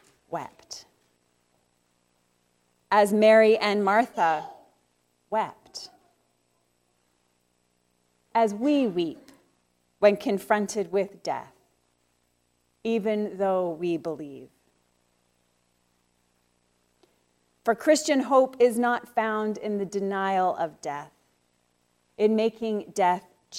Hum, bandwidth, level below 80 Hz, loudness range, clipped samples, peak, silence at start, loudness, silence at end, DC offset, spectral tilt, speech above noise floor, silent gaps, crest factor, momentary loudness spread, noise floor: 60 Hz at -65 dBFS; 16 kHz; -74 dBFS; 11 LU; under 0.1%; -6 dBFS; 0.3 s; -25 LUFS; 0 s; under 0.1%; -4.5 dB/octave; 47 dB; none; 20 dB; 16 LU; -71 dBFS